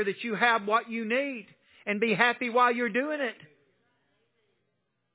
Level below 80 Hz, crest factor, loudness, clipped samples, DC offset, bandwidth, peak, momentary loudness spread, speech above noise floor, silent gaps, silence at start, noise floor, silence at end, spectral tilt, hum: -88 dBFS; 22 dB; -27 LUFS; under 0.1%; under 0.1%; 4 kHz; -6 dBFS; 11 LU; 51 dB; none; 0 s; -78 dBFS; 1.7 s; -2 dB/octave; none